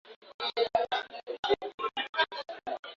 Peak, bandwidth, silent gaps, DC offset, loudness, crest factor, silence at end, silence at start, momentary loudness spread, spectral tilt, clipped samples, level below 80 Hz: -14 dBFS; 7.4 kHz; 0.16-0.22 s, 0.34-0.39 s, 1.39-1.43 s, 1.74-1.78 s, 2.09-2.13 s, 2.79-2.83 s; under 0.1%; -32 LUFS; 20 dB; 0.05 s; 0.05 s; 10 LU; -3 dB/octave; under 0.1%; -68 dBFS